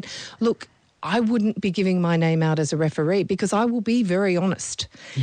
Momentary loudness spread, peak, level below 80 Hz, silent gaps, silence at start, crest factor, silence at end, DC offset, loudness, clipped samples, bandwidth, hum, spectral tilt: 9 LU; -12 dBFS; -60 dBFS; none; 0 s; 10 dB; 0 s; under 0.1%; -22 LUFS; under 0.1%; 9.8 kHz; none; -6 dB/octave